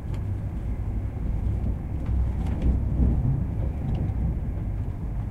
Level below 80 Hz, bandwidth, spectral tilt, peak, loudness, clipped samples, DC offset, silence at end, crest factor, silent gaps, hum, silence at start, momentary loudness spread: -28 dBFS; 3.6 kHz; -10 dB/octave; -12 dBFS; -28 LUFS; under 0.1%; under 0.1%; 0 s; 14 dB; none; none; 0 s; 7 LU